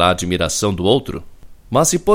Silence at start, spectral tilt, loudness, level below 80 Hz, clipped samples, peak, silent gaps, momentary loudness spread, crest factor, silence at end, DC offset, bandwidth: 0 s; -4 dB/octave; -17 LUFS; -38 dBFS; under 0.1%; 0 dBFS; none; 10 LU; 16 dB; 0 s; under 0.1%; 16.5 kHz